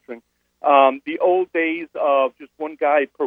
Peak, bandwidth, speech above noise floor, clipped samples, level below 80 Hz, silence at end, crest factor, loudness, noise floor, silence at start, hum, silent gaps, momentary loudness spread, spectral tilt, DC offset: -2 dBFS; 3.8 kHz; 29 dB; under 0.1%; -74 dBFS; 0 s; 18 dB; -19 LUFS; -47 dBFS; 0.1 s; none; none; 17 LU; -6 dB/octave; under 0.1%